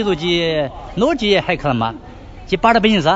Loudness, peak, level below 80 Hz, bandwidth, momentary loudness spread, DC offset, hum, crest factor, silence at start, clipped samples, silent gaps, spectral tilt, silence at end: -17 LUFS; 0 dBFS; -38 dBFS; 7.8 kHz; 10 LU; under 0.1%; none; 16 dB; 0 s; under 0.1%; none; -5.5 dB/octave; 0 s